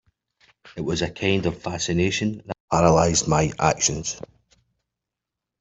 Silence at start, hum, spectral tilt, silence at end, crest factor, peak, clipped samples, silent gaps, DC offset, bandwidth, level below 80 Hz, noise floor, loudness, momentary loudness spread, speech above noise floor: 0.65 s; none; -4 dB/octave; 1.4 s; 20 dB; -4 dBFS; under 0.1%; 2.60-2.68 s; under 0.1%; 8.2 kHz; -46 dBFS; -86 dBFS; -22 LUFS; 13 LU; 64 dB